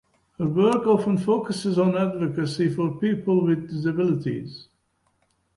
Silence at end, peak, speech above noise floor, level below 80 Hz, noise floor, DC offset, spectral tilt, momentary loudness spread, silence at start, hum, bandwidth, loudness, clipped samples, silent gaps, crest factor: 0.95 s; -8 dBFS; 47 dB; -62 dBFS; -69 dBFS; under 0.1%; -7.5 dB/octave; 8 LU; 0.4 s; none; 11.5 kHz; -23 LUFS; under 0.1%; none; 16 dB